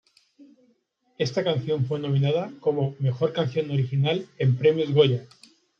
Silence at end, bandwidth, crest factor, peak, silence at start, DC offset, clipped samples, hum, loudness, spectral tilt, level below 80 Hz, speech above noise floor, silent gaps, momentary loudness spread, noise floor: 0.55 s; 6.8 kHz; 18 dB; -6 dBFS; 0.4 s; under 0.1%; under 0.1%; none; -24 LUFS; -7.5 dB/octave; -70 dBFS; 44 dB; none; 6 LU; -67 dBFS